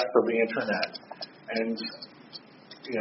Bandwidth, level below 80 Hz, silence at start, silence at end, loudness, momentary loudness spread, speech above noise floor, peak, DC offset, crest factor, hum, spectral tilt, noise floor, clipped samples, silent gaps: 6 kHz; -76 dBFS; 0 s; 0 s; -30 LUFS; 20 LU; 21 dB; -8 dBFS; under 0.1%; 22 dB; none; -2.5 dB/octave; -49 dBFS; under 0.1%; none